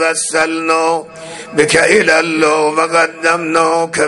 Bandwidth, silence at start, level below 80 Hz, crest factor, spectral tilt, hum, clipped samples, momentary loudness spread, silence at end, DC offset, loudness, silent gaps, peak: 11.5 kHz; 0 s; -52 dBFS; 14 dB; -3 dB/octave; none; under 0.1%; 9 LU; 0 s; under 0.1%; -12 LUFS; none; 0 dBFS